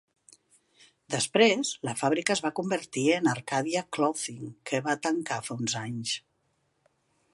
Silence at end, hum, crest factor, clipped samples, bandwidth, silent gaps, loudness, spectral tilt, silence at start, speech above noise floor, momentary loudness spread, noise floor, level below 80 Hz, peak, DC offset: 1.15 s; none; 22 dB; under 0.1%; 11.5 kHz; none; -28 LUFS; -3.5 dB/octave; 1.1 s; 45 dB; 11 LU; -74 dBFS; -74 dBFS; -8 dBFS; under 0.1%